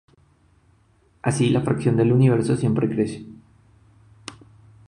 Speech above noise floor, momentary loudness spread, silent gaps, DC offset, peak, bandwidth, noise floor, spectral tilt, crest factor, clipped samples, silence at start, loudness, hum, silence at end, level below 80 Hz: 40 dB; 23 LU; none; under 0.1%; -8 dBFS; 11 kHz; -59 dBFS; -7.5 dB/octave; 16 dB; under 0.1%; 1.25 s; -21 LUFS; none; 0.55 s; -54 dBFS